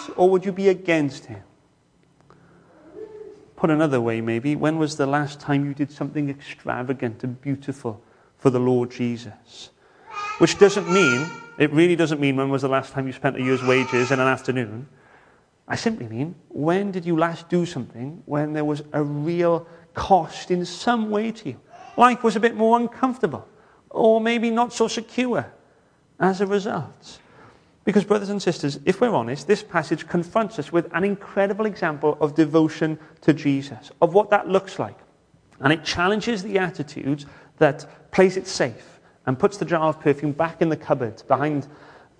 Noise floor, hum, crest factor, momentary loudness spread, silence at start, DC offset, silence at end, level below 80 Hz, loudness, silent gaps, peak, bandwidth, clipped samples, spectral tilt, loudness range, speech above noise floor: -60 dBFS; none; 22 dB; 13 LU; 0 s; under 0.1%; 0.45 s; -58 dBFS; -22 LUFS; none; -2 dBFS; 10.5 kHz; under 0.1%; -6 dB/octave; 5 LU; 39 dB